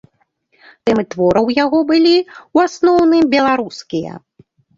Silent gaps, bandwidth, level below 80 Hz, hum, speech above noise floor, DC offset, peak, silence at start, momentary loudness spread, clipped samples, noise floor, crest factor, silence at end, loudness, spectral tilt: none; 7.6 kHz; -50 dBFS; none; 47 dB; under 0.1%; -2 dBFS; 0.85 s; 12 LU; under 0.1%; -61 dBFS; 14 dB; 0.6 s; -14 LUFS; -5.5 dB/octave